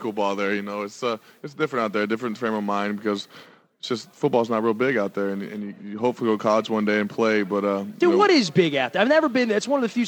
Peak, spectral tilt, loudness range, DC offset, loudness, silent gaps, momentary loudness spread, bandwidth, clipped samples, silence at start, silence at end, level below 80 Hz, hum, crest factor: -2 dBFS; -5.5 dB/octave; 6 LU; under 0.1%; -23 LUFS; none; 12 LU; 18.5 kHz; under 0.1%; 0 s; 0 s; -76 dBFS; none; 20 dB